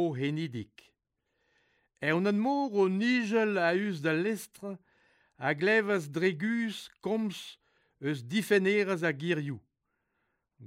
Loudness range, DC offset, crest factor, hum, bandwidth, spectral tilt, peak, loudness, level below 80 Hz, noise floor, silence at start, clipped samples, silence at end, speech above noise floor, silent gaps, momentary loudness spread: 2 LU; under 0.1%; 18 dB; none; 16 kHz; -6 dB/octave; -14 dBFS; -30 LUFS; -78 dBFS; -81 dBFS; 0 s; under 0.1%; 0 s; 51 dB; none; 16 LU